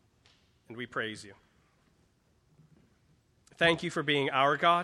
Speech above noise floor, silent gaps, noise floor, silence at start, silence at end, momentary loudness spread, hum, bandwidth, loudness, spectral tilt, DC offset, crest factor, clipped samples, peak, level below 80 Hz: 40 dB; none; -69 dBFS; 0.7 s; 0 s; 21 LU; none; 12 kHz; -29 LUFS; -4.5 dB/octave; under 0.1%; 22 dB; under 0.1%; -12 dBFS; -68 dBFS